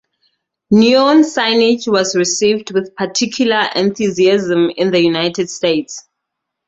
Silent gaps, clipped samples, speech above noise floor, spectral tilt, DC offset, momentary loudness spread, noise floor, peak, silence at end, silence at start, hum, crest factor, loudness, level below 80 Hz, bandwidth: none; under 0.1%; 64 dB; -4 dB/octave; under 0.1%; 8 LU; -77 dBFS; 0 dBFS; 0.7 s; 0.7 s; none; 14 dB; -14 LUFS; -56 dBFS; 8.2 kHz